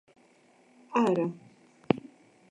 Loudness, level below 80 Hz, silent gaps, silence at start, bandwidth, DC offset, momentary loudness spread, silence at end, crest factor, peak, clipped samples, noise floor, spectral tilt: -30 LUFS; -68 dBFS; none; 0.9 s; 10 kHz; under 0.1%; 8 LU; 0.5 s; 26 dB; -6 dBFS; under 0.1%; -62 dBFS; -7 dB/octave